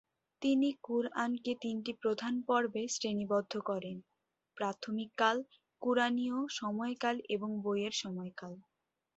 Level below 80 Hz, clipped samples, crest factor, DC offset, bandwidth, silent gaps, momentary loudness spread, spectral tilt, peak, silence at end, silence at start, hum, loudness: -80 dBFS; under 0.1%; 20 dB; under 0.1%; 8 kHz; none; 10 LU; -3 dB/octave; -16 dBFS; 0.55 s; 0.4 s; none; -35 LUFS